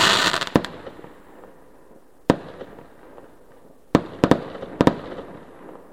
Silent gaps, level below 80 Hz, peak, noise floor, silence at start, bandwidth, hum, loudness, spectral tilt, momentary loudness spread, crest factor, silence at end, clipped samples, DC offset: none; -48 dBFS; 0 dBFS; -52 dBFS; 0 s; 16.5 kHz; none; -22 LUFS; -4 dB/octave; 23 LU; 24 dB; 0.15 s; under 0.1%; 0.3%